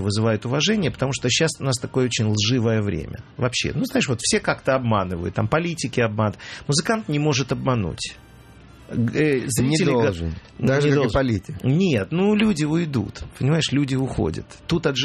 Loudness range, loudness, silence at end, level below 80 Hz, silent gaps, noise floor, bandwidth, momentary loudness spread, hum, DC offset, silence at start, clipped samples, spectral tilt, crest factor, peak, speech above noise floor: 2 LU; -22 LUFS; 0 s; -44 dBFS; none; -46 dBFS; 13.5 kHz; 7 LU; none; under 0.1%; 0 s; under 0.1%; -5 dB/octave; 16 dB; -4 dBFS; 24 dB